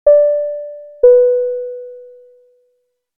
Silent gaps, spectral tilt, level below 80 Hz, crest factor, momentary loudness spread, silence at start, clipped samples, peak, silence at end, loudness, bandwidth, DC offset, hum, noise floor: none; -8 dB/octave; -56 dBFS; 14 dB; 21 LU; 0.05 s; under 0.1%; 0 dBFS; 1.15 s; -13 LUFS; 1.9 kHz; under 0.1%; none; -65 dBFS